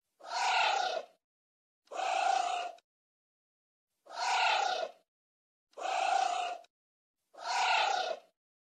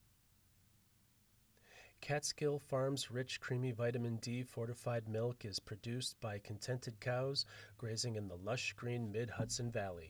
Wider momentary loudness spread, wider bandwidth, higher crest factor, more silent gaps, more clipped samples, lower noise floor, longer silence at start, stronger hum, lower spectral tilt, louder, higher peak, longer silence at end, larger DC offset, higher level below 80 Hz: first, 15 LU vs 7 LU; second, 11 kHz vs over 20 kHz; about the same, 18 dB vs 16 dB; first, 1.24-1.82 s, 2.84-3.87 s, 5.08-5.67 s, 6.70-7.14 s vs none; neither; first, under -90 dBFS vs -72 dBFS; second, 0.2 s vs 1.7 s; neither; second, 2 dB/octave vs -4.5 dB/octave; first, -32 LUFS vs -42 LUFS; first, -18 dBFS vs -26 dBFS; first, 0.4 s vs 0 s; neither; second, under -90 dBFS vs -72 dBFS